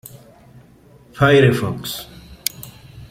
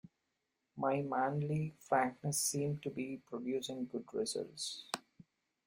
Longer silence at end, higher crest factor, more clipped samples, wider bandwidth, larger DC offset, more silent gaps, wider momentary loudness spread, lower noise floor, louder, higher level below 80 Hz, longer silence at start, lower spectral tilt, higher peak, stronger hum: second, 0.05 s vs 0.45 s; about the same, 20 dB vs 20 dB; neither; about the same, 16.5 kHz vs 16.5 kHz; neither; neither; first, 25 LU vs 9 LU; second, -48 dBFS vs -86 dBFS; first, -17 LUFS vs -38 LUFS; first, -48 dBFS vs -76 dBFS; first, 1.15 s vs 0.75 s; about the same, -5.5 dB/octave vs -4.5 dB/octave; first, 0 dBFS vs -18 dBFS; neither